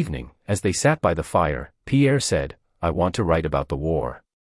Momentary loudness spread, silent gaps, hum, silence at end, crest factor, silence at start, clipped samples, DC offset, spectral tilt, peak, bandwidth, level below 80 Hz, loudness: 10 LU; none; none; 0.25 s; 16 dB; 0 s; under 0.1%; under 0.1%; -5.5 dB/octave; -6 dBFS; 12 kHz; -40 dBFS; -23 LUFS